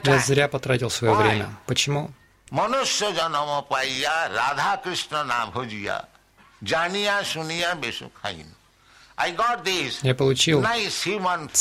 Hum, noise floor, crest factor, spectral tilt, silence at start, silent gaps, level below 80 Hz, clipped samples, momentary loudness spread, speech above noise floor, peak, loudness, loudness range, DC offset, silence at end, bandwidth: none; -54 dBFS; 20 dB; -3.5 dB/octave; 0 s; none; -56 dBFS; under 0.1%; 11 LU; 31 dB; -4 dBFS; -23 LUFS; 4 LU; under 0.1%; 0 s; 16 kHz